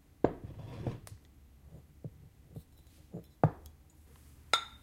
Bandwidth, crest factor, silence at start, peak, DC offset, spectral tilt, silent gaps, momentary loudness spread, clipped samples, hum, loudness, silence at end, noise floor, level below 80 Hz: 16 kHz; 30 dB; 0.25 s; -10 dBFS; under 0.1%; -5 dB/octave; none; 25 LU; under 0.1%; none; -36 LUFS; 0.05 s; -59 dBFS; -56 dBFS